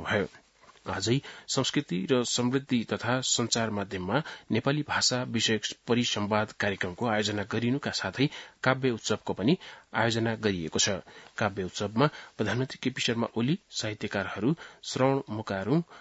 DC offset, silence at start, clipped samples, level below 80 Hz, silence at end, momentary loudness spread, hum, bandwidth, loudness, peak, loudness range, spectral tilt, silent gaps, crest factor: under 0.1%; 0 s; under 0.1%; -66 dBFS; 0 s; 6 LU; none; 8.2 kHz; -29 LUFS; -6 dBFS; 2 LU; -4 dB/octave; none; 22 dB